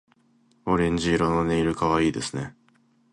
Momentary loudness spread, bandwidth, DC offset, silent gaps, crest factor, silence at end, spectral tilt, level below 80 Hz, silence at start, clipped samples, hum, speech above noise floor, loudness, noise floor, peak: 12 LU; 11.5 kHz; under 0.1%; none; 18 dB; 0.6 s; -6 dB/octave; -44 dBFS; 0.65 s; under 0.1%; none; 39 dB; -24 LUFS; -62 dBFS; -8 dBFS